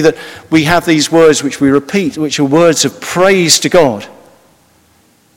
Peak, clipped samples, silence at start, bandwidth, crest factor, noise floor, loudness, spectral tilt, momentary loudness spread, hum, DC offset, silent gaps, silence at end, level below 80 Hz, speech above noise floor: 0 dBFS; 1%; 0 s; over 20 kHz; 12 dB; -50 dBFS; -10 LUFS; -4 dB/octave; 7 LU; none; under 0.1%; none; 1.25 s; -48 dBFS; 40 dB